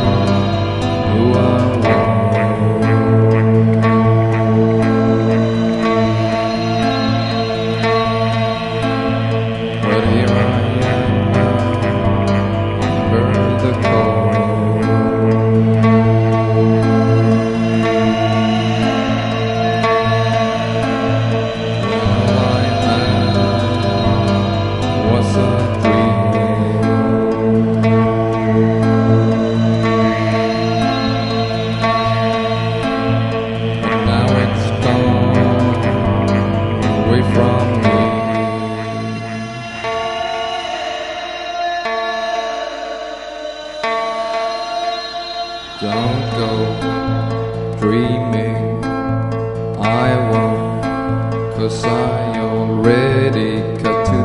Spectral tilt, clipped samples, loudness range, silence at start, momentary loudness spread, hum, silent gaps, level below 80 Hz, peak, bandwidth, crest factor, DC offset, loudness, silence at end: -7.5 dB/octave; under 0.1%; 7 LU; 0 s; 7 LU; none; none; -36 dBFS; 0 dBFS; 10.5 kHz; 14 dB; under 0.1%; -15 LUFS; 0 s